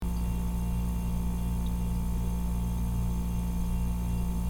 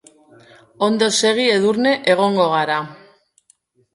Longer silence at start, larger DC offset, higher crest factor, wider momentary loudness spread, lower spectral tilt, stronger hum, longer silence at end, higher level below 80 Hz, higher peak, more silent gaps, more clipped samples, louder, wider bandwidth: second, 0 s vs 0.8 s; neither; second, 10 dB vs 18 dB; second, 1 LU vs 6 LU; first, -7 dB/octave vs -3.5 dB/octave; first, 60 Hz at -50 dBFS vs none; second, 0 s vs 1 s; first, -32 dBFS vs -66 dBFS; second, -20 dBFS vs 0 dBFS; neither; neither; second, -32 LUFS vs -17 LUFS; first, 17.5 kHz vs 11.5 kHz